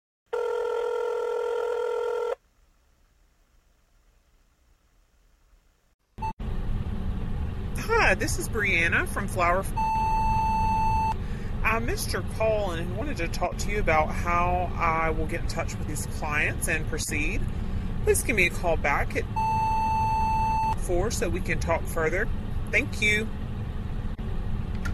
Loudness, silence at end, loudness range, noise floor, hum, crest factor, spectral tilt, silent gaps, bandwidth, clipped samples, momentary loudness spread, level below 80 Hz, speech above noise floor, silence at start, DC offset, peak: -27 LUFS; 0 s; 11 LU; -63 dBFS; none; 18 dB; -5 dB/octave; 5.94-5.99 s, 6.33-6.37 s; 14 kHz; under 0.1%; 10 LU; -32 dBFS; 38 dB; 0.3 s; under 0.1%; -8 dBFS